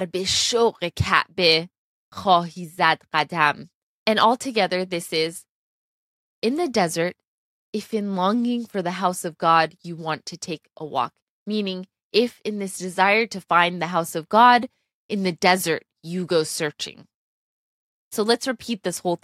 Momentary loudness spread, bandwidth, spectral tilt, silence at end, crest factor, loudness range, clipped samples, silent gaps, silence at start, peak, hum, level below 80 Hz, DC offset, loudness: 14 LU; 15.5 kHz; -3.5 dB/octave; 0.1 s; 22 dB; 6 LU; under 0.1%; 1.78-2.12 s, 3.74-4.06 s, 5.49-6.42 s, 7.27-7.73 s, 11.22-11.46 s, 12.03-12.11 s, 14.94-15.09 s, 17.14-18.11 s; 0 s; -2 dBFS; none; -56 dBFS; under 0.1%; -22 LUFS